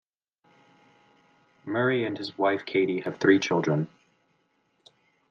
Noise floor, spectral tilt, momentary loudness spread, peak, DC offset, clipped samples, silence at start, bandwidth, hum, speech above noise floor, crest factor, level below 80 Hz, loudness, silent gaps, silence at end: -71 dBFS; -6 dB/octave; 10 LU; -8 dBFS; under 0.1%; under 0.1%; 1.65 s; 7.2 kHz; none; 46 dB; 22 dB; -76 dBFS; -26 LUFS; none; 1.45 s